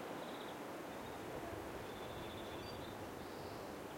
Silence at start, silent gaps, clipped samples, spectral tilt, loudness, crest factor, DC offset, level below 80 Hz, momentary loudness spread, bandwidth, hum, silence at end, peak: 0 s; none; under 0.1%; -4.5 dB/octave; -48 LUFS; 14 dB; under 0.1%; -66 dBFS; 2 LU; 16.5 kHz; none; 0 s; -34 dBFS